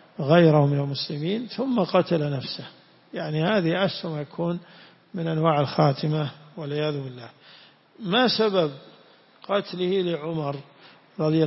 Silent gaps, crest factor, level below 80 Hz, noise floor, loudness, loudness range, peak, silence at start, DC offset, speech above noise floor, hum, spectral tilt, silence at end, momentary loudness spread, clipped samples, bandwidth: none; 22 dB; -66 dBFS; -54 dBFS; -24 LUFS; 3 LU; -4 dBFS; 0.2 s; under 0.1%; 31 dB; none; -10 dB/octave; 0 s; 17 LU; under 0.1%; 5.8 kHz